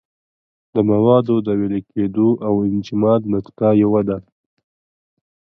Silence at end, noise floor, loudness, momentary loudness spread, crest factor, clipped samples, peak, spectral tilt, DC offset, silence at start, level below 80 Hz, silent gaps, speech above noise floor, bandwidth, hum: 1.4 s; under -90 dBFS; -17 LUFS; 9 LU; 16 dB; under 0.1%; -2 dBFS; -10 dB/octave; under 0.1%; 0.75 s; -52 dBFS; none; over 74 dB; 6.2 kHz; none